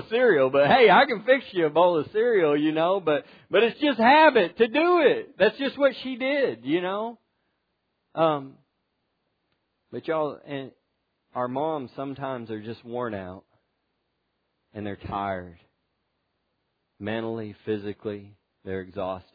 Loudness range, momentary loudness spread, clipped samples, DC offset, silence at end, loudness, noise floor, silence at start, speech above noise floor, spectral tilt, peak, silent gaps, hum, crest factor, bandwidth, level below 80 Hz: 15 LU; 18 LU; under 0.1%; under 0.1%; 0.15 s; -23 LUFS; -76 dBFS; 0 s; 53 dB; -8 dB/octave; -6 dBFS; none; none; 20 dB; 5 kHz; -66 dBFS